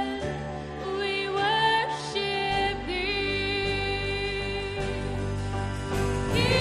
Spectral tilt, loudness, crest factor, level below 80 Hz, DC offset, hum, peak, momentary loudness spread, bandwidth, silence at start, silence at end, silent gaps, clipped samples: -5 dB/octave; -28 LUFS; 18 dB; -40 dBFS; under 0.1%; none; -10 dBFS; 8 LU; 13.5 kHz; 0 s; 0 s; none; under 0.1%